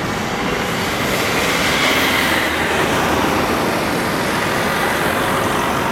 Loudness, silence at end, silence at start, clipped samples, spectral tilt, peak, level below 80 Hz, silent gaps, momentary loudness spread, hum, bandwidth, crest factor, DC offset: -17 LUFS; 0 s; 0 s; under 0.1%; -3.5 dB/octave; -4 dBFS; -38 dBFS; none; 5 LU; none; 16.5 kHz; 14 dB; under 0.1%